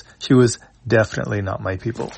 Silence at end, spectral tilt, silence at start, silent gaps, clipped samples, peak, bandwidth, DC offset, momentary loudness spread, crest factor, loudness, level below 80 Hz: 0 s; -6 dB/octave; 0.2 s; none; under 0.1%; -2 dBFS; 8.8 kHz; under 0.1%; 10 LU; 18 dB; -19 LUFS; -50 dBFS